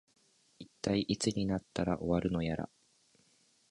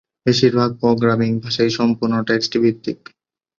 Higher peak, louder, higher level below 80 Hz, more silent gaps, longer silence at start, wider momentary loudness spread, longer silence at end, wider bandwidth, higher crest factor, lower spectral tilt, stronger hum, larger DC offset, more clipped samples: second, -18 dBFS vs -2 dBFS; second, -34 LUFS vs -17 LUFS; about the same, -56 dBFS vs -54 dBFS; neither; first, 0.6 s vs 0.25 s; first, 13 LU vs 5 LU; first, 1.05 s vs 0.65 s; first, 11.5 kHz vs 7.4 kHz; about the same, 18 dB vs 16 dB; about the same, -5.5 dB/octave vs -6 dB/octave; neither; neither; neither